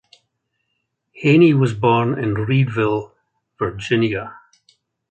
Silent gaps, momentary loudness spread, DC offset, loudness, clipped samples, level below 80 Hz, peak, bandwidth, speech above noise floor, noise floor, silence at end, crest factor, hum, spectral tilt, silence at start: none; 13 LU; under 0.1%; -18 LUFS; under 0.1%; -52 dBFS; -2 dBFS; 8.8 kHz; 57 dB; -73 dBFS; 0.75 s; 18 dB; none; -8 dB/octave; 1.15 s